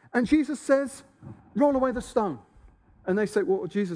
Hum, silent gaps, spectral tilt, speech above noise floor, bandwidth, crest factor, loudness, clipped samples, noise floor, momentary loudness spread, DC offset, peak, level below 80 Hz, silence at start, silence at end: none; none; -6.5 dB/octave; 30 dB; 11 kHz; 18 dB; -26 LUFS; under 0.1%; -55 dBFS; 13 LU; under 0.1%; -10 dBFS; -54 dBFS; 0.15 s; 0 s